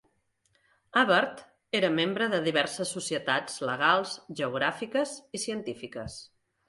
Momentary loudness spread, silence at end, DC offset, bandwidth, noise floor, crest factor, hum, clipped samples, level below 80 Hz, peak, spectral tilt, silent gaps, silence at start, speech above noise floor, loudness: 14 LU; 0.45 s; under 0.1%; 11.5 kHz; -72 dBFS; 20 dB; none; under 0.1%; -66 dBFS; -10 dBFS; -3.5 dB/octave; none; 0.95 s; 43 dB; -28 LUFS